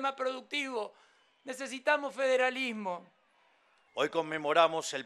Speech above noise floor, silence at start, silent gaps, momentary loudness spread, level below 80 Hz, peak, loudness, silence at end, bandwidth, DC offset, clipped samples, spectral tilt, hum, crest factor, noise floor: 36 dB; 0 s; none; 17 LU; under -90 dBFS; -10 dBFS; -31 LUFS; 0 s; 12.5 kHz; under 0.1%; under 0.1%; -2.5 dB/octave; none; 22 dB; -68 dBFS